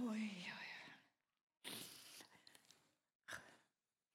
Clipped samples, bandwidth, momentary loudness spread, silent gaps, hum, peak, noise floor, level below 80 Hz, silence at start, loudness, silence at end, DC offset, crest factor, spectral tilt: under 0.1%; 16 kHz; 19 LU; 1.43-1.47 s, 3.15-3.20 s; none; -34 dBFS; under -90 dBFS; under -90 dBFS; 0 s; -52 LUFS; 0.55 s; under 0.1%; 20 dB; -3.5 dB/octave